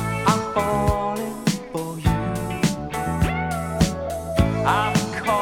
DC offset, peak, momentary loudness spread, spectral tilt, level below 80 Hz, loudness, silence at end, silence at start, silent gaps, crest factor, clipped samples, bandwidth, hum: under 0.1%; -4 dBFS; 6 LU; -5.5 dB/octave; -34 dBFS; -23 LUFS; 0 s; 0 s; none; 18 dB; under 0.1%; 18.5 kHz; none